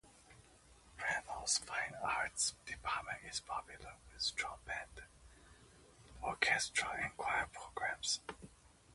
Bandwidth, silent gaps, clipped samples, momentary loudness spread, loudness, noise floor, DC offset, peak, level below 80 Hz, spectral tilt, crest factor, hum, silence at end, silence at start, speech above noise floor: 11.5 kHz; none; under 0.1%; 19 LU; -39 LUFS; -64 dBFS; under 0.1%; -14 dBFS; -64 dBFS; 0 dB/octave; 28 dB; none; 0 s; 0.05 s; 23 dB